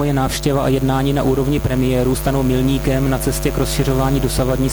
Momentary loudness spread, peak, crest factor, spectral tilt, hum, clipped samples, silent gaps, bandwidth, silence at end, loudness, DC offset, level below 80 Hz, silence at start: 2 LU; -4 dBFS; 12 dB; -6 dB/octave; none; under 0.1%; none; over 20 kHz; 0 s; -17 LUFS; under 0.1%; -26 dBFS; 0 s